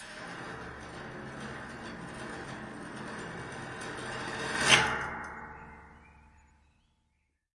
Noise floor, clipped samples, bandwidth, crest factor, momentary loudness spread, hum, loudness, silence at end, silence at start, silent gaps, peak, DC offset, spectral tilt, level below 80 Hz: -77 dBFS; under 0.1%; 11.5 kHz; 30 dB; 20 LU; none; -33 LUFS; 1.15 s; 0 s; none; -6 dBFS; under 0.1%; -2 dB/octave; -58 dBFS